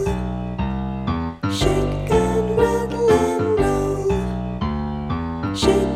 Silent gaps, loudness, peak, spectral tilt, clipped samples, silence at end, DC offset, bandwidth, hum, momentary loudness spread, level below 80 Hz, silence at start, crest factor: none; -21 LUFS; -2 dBFS; -6.5 dB/octave; under 0.1%; 0 s; under 0.1%; 15 kHz; none; 8 LU; -30 dBFS; 0 s; 18 dB